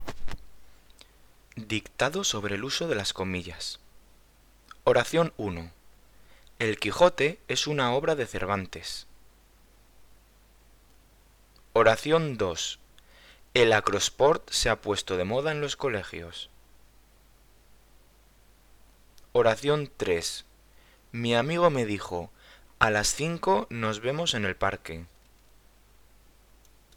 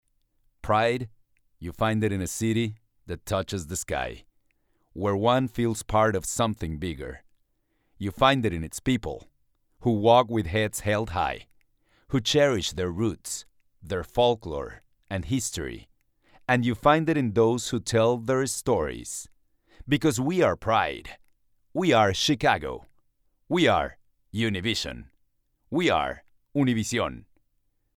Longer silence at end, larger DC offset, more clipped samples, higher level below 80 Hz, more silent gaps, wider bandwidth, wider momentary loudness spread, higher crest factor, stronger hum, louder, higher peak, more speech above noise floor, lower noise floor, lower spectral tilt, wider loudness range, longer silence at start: first, 1.9 s vs 0.8 s; neither; neither; about the same, -50 dBFS vs -48 dBFS; neither; about the same, 19 kHz vs 17.5 kHz; about the same, 17 LU vs 15 LU; first, 28 dB vs 22 dB; neither; about the same, -27 LUFS vs -26 LUFS; first, 0 dBFS vs -6 dBFS; second, 32 dB vs 47 dB; second, -58 dBFS vs -72 dBFS; second, -3.5 dB/octave vs -5 dB/octave; first, 8 LU vs 4 LU; second, 0 s vs 0.65 s